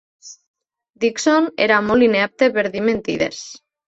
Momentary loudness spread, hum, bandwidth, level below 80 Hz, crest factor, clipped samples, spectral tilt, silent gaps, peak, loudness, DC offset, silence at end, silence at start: 8 LU; none; 8.2 kHz; -54 dBFS; 18 dB; under 0.1%; -4 dB/octave; 0.47-0.54 s; -2 dBFS; -17 LUFS; under 0.1%; 0.3 s; 0.25 s